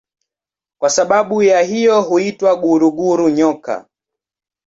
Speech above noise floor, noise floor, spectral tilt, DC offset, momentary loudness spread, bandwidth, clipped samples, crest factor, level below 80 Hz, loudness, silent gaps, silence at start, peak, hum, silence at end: 76 dB; -89 dBFS; -4.5 dB/octave; under 0.1%; 7 LU; 8 kHz; under 0.1%; 14 dB; -60 dBFS; -14 LUFS; none; 0.8 s; -2 dBFS; none; 0.85 s